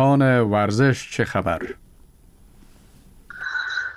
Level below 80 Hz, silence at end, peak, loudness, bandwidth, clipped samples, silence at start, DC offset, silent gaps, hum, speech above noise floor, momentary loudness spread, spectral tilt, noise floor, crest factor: -50 dBFS; 0 s; -8 dBFS; -21 LUFS; 12 kHz; under 0.1%; 0 s; under 0.1%; none; none; 31 dB; 17 LU; -6.5 dB/octave; -50 dBFS; 14 dB